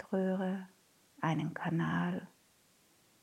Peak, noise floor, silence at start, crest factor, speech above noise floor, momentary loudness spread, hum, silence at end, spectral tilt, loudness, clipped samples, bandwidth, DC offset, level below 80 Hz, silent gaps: -20 dBFS; -68 dBFS; 0 s; 18 dB; 34 dB; 10 LU; none; 0.95 s; -7.5 dB/octave; -36 LUFS; under 0.1%; 13 kHz; under 0.1%; -78 dBFS; none